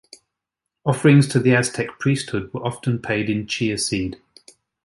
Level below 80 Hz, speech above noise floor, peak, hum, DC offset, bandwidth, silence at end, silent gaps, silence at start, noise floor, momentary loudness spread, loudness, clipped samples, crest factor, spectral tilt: -52 dBFS; 63 dB; -2 dBFS; none; under 0.1%; 11.5 kHz; 0.7 s; none; 0.85 s; -83 dBFS; 12 LU; -20 LUFS; under 0.1%; 18 dB; -5.5 dB/octave